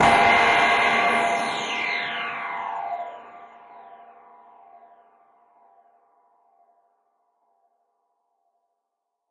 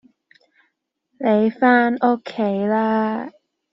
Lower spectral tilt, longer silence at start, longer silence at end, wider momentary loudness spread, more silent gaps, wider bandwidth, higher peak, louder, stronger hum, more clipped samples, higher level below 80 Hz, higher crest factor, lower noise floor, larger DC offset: second, -3 dB/octave vs -5 dB/octave; second, 0 s vs 1.2 s; first, 5.35 s vs 0.45 s; first, 17 LU vs 9 LU; neither; first, 11.5 kHz vs 5.8 kHz; second, -6 dBFS vs -2 dBFS; about the same, -21 LUFS vs -19 LUFS; neither; neither; about the same, -62 dBFS vs -66 dBFS; about the same, 20 dB vs 18 dB; first, -81 dBFS vs -72 dBFS; neither